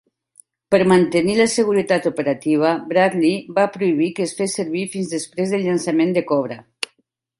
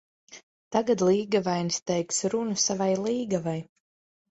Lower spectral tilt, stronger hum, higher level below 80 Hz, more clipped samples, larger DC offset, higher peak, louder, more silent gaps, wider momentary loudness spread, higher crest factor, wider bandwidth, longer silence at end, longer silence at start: about the same, -5 dB/octave vs -4.5 dB/octave; neither; first, -60 dBFS vs -68 dBFS; neither; neither; first, -2 dBFS vs -10 dBFS; first, -19 LUFS vs -26 LUFS; second, none vs 0.43-0.71 s, 1.82-1.86 s; first, 9 LU vs 6 LU; about the same, 16 dB vs 18 dB; first, 11.5 kHz vs 8.2 kHz; about the same, 0.55 s vs 0.65 s; first, 0.7 s vs 0.3 s